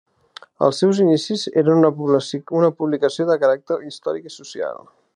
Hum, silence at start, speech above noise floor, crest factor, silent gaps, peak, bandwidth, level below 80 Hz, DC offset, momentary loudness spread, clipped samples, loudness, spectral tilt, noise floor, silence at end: none; 0.6 s; 27 dB; 18 dB; none; -2 dBFS; 10.5 kHz; -72 dBFS; under 0.1%; 13 LU; under 0.1%; -19 LUFS; -6 dB/octave; -45 dBFS; 0.4 s